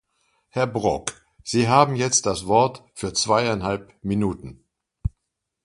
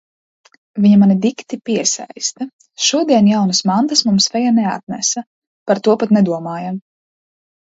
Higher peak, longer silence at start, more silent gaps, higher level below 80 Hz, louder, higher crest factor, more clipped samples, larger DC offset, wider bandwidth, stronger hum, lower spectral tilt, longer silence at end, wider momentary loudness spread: about the same, 0 dBFS vs 0 dBFS; second, 0.55 s vs 0.75 s; second, none vs 2.53-2.59 s, 4.83-4.87 s, 5.27-5.66 s; first, -44 dBFS vs -60 dBFS; second, -22 LUFS vs -15 LUFS; first, 22 dB vs 16 dB; neither; neither; first, 11.5 kHz vs 8 kHz; neither; about the same, -4 dB/octave vs -4.5 dB/octave; second, 0.55 s vs 0.95 s; about the same, 15 LU vs 14 LU